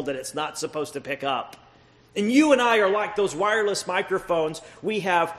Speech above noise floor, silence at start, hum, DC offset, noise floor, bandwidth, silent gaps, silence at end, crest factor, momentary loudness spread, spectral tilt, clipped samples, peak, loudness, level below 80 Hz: 31 dB; 0 s; none; under 0.1%; -55 dBFS; 13 kHz; none; 0 s; 20 dB; 12 LU; -4 dB/octave; under 0.1%; -4 dBFS; -24 LUFS; -62 dBFS